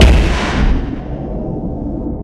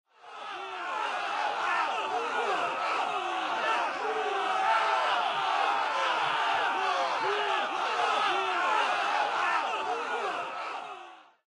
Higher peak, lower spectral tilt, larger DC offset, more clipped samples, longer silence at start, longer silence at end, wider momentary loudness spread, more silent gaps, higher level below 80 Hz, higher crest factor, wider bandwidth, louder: first, 0 dBFS vs -14 dBFS; first, -6 dB/octave vs -1 dB/octave; neither; neither; second, 0 s vs 0.25 s; second, 0 s vs 0.3 s; about the same, 10 LU vs 9 LU; neither; first, -16 dBFS vs -78 dBFS; about the same, 14 dB vs 16 dB; about the same, 11 kHz vs 11 kHz; first, -18 LUFS vs -29 LUFS